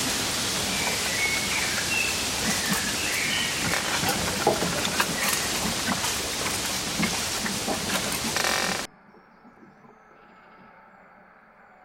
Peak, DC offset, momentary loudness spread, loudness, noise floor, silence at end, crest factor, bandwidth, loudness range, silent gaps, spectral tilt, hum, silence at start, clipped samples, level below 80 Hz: -6 dBFS; under 0.1%; 3 LU; -24 LUFS; -53 dBFS; 0.8 s; 20 dB; 16.5 kHz; 6 LU; none; -1.5 dB/octave; none; 0 s; under 0.1%; -50 dBFS